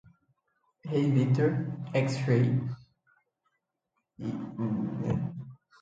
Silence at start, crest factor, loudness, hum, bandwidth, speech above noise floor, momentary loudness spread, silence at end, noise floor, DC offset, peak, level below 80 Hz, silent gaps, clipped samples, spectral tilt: 0.85 s; 18 dB; -30 LUFS; none; 7.8 kHz; 54 dB; 15 LU; 0.25 s; -82 dBFS; under 0.1%; -12 dBFS; -62 dBFS; none; under 0.1%; -8.5 dB/octave